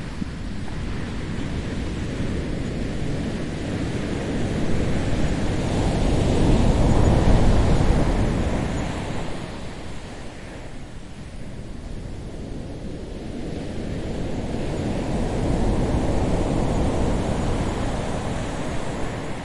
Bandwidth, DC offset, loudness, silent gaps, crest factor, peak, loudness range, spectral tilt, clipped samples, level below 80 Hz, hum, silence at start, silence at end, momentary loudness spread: 11.5 kHz; under 0.1%; -25 LUFS; none; 18 dB; -4 dBFS; 14 LU; -6.5 dB/octave; under 0.1%; -28 dBFS; none; 0 s; 0 s; 16 LU